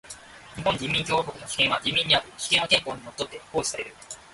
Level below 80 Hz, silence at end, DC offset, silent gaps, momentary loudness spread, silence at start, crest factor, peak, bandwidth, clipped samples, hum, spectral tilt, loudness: -56 dBFS; 0.1 s; under 0.1%; none; 17 LU; 0.05 s; 22 dB; -6 dBFS; 12 kHz; under 0.1%; none; -2 dB/octave; -24 LUFS